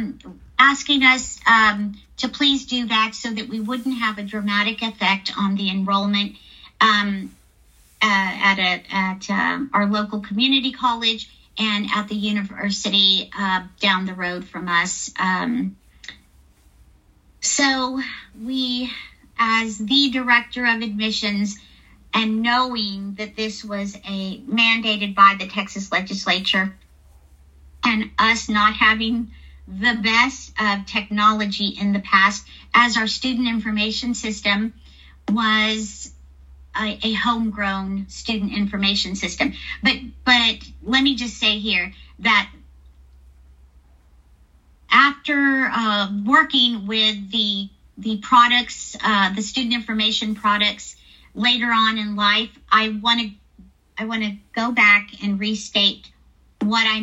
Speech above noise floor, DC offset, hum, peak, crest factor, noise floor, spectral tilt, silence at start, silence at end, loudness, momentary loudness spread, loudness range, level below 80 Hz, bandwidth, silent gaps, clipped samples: 34 dB; under 0.1%; none; 0 dBFS; 20 dB; -54 dBFS; -3 dB/octave; 0 s; 0 s; -19 LUFS; 13 LU; 5 LU; -48 dBFS; 10 kHz; none; under 0.1%